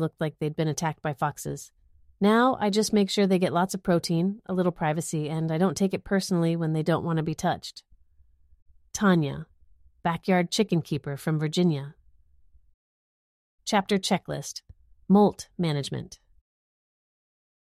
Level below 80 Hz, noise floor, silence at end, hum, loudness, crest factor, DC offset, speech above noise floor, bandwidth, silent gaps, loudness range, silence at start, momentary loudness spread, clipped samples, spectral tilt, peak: -58 dBFS; -59 dBFS; 1.5 s; none; -26 LUFS; 18 dB; under 0.1%; 34 dB; 15 kHz; 8.62-8.66 s, 12.74-13.58 s; 5 LU; 0 s; 11 LU; under 0.1%; -5.5 dB/octave; -8 dBFS